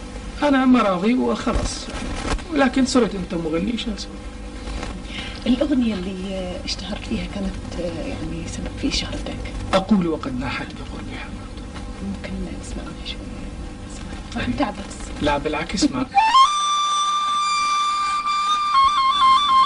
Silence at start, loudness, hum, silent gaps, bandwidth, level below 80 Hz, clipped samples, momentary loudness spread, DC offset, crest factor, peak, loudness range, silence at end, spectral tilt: 0 s; -21 LUFS; none; none; 10.5 kHz; -34 dBFS; under 0.1%; 17 LU; under 0.1%; 16 dB; -6 dBFS; 11 LU; 0 s; -4.5 dB/octave